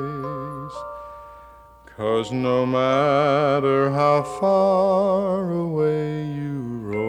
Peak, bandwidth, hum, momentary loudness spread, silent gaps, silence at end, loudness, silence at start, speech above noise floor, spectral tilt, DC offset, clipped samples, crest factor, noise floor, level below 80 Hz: -8 dBFS; 10.5 kHz; none; 15 LU; none; 0 s; -21 LUFS; 0 s; 27 dB; -7.5 dB/octave; under 0.1%; under 0.1%; 14 dB; -47 dBFS; -54 dBFS